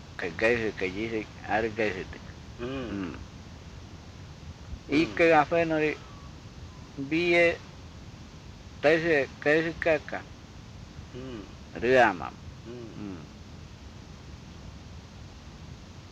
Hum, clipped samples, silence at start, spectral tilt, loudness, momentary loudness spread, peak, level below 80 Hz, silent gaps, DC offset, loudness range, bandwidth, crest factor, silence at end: none; under 0.1%; 0 s; -6 dB/octave; -27 LUFS; 24 LU; -10 dBFS; -52 dBFS; none; under 0.1%; 10 LU; 9.4 kHz; 20 dB; 0 s